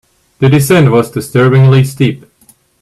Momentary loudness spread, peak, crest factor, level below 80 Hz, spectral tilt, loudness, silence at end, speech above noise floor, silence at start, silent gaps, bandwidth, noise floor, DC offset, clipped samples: 7 LU; 0 dBFS; 10 dB; -44 dBFS; -6.5 dB/octave; -9 LUFS; 0.65 s; 40 dB; 0.4 s; none; 13 kHz; -48 dBFS; under 0.1%; under 0.1%